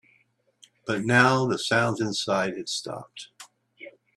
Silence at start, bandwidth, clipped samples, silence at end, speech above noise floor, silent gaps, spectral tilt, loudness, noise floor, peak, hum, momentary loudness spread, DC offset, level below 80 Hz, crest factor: 0.85 s; 13 kHz; under 0.1%; 0.25 s; 42 dB; none; -4.5 dB/octave; -24 LUFS; -66 dBFS; -4 dBFS; none; 23 LU; under 0.1%; -66 dBFS; 24 dB